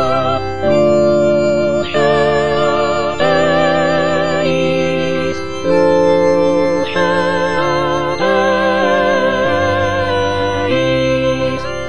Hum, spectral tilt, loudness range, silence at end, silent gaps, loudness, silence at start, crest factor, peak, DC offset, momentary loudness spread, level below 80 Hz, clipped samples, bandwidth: none; -5.5 dB/octave; 1 LU; 0 s; none; -14 LUFS; 0 s; 12 dB; -2 dBFS; 4%; 4 LU; -40 dBFS; under 0.1%; 10 kHz